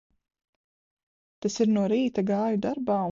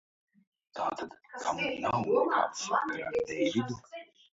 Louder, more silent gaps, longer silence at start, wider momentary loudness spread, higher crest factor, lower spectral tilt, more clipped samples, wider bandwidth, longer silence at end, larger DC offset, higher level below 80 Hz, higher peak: first, -26 LUFS vs -31 LUFS; neither; first, 1.45 s vs 0.75 s; second, 6 LU vs 15 LU; about the same, 16 dB vs 18 dB; first, -6.5 dB/octave vs -4.5 dB/octave; neither; about the same, 7.6 kHz vs 7.8 kHz; second, 0 s vs 0.3 s; neither; about the same, -68 dBFS vs -68 dBFS; about the same, -12 dBFS vs -14 dBFS